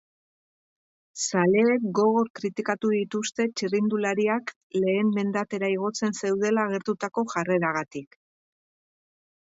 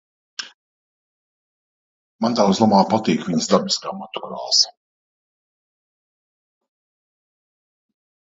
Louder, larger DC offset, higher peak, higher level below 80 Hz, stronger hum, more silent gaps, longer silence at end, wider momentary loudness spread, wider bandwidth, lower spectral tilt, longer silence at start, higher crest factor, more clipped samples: second, -25 LUFS vs -18 LUFS; neither; second, -10 dBFS vs 0 dBFS; second, -72 dBFS vs -64 dBFS; neither; second, 2.30-2.34 s, 4.56-4.70 s vs 0.54-2.19 s; second, 1.4 s vs 3.6 s; second, 8 LU vs 18 LU; about the same, 8 kHz vs 8 kHz; about the same, -5 dB/octave vs -4 dB/octave; first, 1.15 s vs 0.4 s; second, 16 dB vs 22 dB; neither